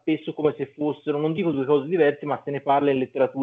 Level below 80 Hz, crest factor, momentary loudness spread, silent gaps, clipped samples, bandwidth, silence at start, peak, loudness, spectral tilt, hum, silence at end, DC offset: -72 dBFS; 16 dB; 7 LU; none; under 0.1%; 4.3 kHz; 0.05 s; -8 dBFS; -24 LUFS; -9.5 dB/octave; none; 0 s; under 0.1%